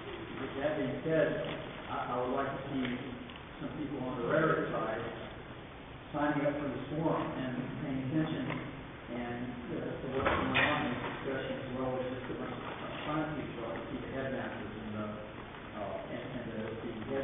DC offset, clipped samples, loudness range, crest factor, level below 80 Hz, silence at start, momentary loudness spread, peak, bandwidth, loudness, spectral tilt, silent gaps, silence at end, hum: under 0.1%; under 0.1%; 5 LU; 20 dB; -56 dBFS; 0 s; 12 LU; -16 dBFS; 3.8 kHz; -36 LUFS; -3 dB/octave; none; 0 s; none